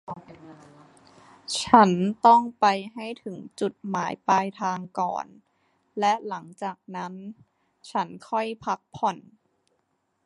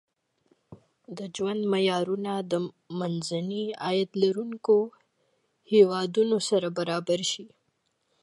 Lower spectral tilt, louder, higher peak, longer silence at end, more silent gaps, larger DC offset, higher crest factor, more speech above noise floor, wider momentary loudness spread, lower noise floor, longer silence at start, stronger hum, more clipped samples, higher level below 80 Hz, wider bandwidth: about the same, -5 dB/octave vs -5 dB/octave; about the same, -25 LUFS vs -27 LUFS; first, 0 dBFS vs -8 dBFS; first, 1.05 s vs 0.75 s; neither; neither; first, 26 dB vs 20 dB; about the same, 49 dB vs 48 dB; first, 21 LU vs 11 LU; about the same, -74 dBFS vs -75 dBFS; second, 0.1 s vs 0.7 s; neither; neither; first, -68 dBFS vs -78 dBFS; about the same, 11.5 kHz vs 11.5 kHz